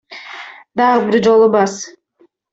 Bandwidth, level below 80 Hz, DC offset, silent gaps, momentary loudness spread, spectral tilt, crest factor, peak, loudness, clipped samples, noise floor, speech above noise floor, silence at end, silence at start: 8 kHz; -60 dBFS; under 0.1%; none; 21 LU; -5 dB/octave; 14 dB; -2 dBFS; -13 LUFS; under 0.1%; -55 dBFS; 43 dB; 0.65 s; 0.1 s